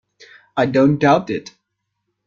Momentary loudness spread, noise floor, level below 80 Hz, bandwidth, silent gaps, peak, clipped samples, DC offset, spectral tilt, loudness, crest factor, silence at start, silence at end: 13 LU; -75 dBFS; -58 dBFS; 7.2 kHz; none; -2 dBFS; under 0.1%; under 0.1%; -7 dB/octave; -17 LUFS; 16 dB; 0.55 s; 0.85 s